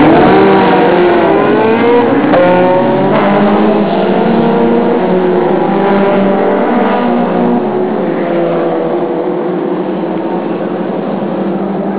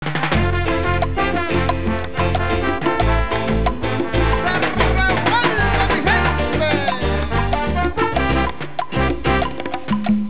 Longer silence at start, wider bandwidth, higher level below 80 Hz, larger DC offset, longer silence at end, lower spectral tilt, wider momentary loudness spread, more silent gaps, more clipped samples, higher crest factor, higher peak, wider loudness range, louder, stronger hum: about the same, 0 s vs 0 s; about the same, 4 kHz vs 4 kHz; second, -44 dBFS vs -26 dBFS; second, under 0.1% vs 4%; about the same, 0 s vs 0 s; about the same, -11 dB/octave vs -10 dB/octave; first, 8 LU vs 5 LU; neither; neither; about the same, 10 dB vs 14 dB; first, 0 dBFS vs -4 dBFS; first, 6 LU vs 2 LU; first, -10 LUFS vs -19 LUFS; neither